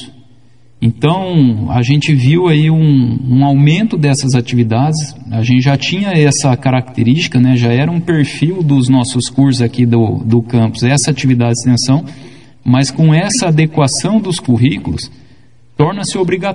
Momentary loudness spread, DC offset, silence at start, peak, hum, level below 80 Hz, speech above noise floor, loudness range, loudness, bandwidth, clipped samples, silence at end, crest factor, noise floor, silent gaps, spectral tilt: 5 LU; 0.8%; 0 s; 0 dBFS; none; -44 dBFS; 36 dB; 2 LU; -12 LUFS; 11 kHz; under 0.1%; 0 s; 12 dB; -47 dBFS; none; -6 dB/octave